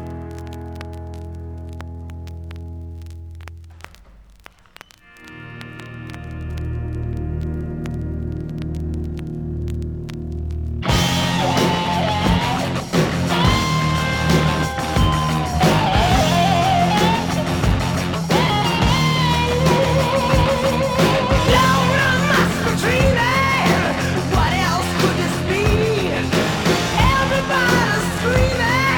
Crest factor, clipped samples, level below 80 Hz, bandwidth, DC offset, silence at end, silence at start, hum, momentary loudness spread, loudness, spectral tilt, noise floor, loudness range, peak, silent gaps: 16 dB; under 0.1%; -30 dBFS; over 20 kHz; under 0.1%; 0 s; 0 s; none; 17 LU; -18 LUFS; -5 dB/octave; -46 dBFS; 18 LU; -2 dBFS; none